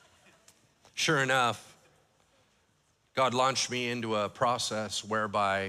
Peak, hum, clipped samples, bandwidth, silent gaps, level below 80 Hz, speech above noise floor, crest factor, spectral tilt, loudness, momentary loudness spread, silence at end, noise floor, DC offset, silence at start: -14 dBFS; none; under 0.1%; 15.5 kHz; none; -74 dBFS; 41 dB; 18 dB; -3 dB/octave; -29 LUFS; 7 LU; 0 s; -71 dBFS; under 0.1%; 0.95 s